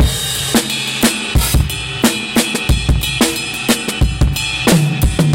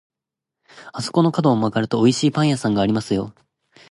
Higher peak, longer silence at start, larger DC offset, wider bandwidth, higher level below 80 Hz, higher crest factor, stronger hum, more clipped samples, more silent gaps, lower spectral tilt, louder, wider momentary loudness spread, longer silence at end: about the same, -2 dBFS vs -4 dBFS; second, 0 s vs 0.75 s; neither; first, 17 kHz vs 11.5 kHz; first, -20 dBFS vs -54 dBFS; about the same, 14 dB vs 18 dB; neither; neither; neither; second, -4 dB/octave vs -6 dB/octave; first, -15 LUFS vs -19 LUFS; second, 3 LU vs 10 LU; second, 0 s vs 0.6 s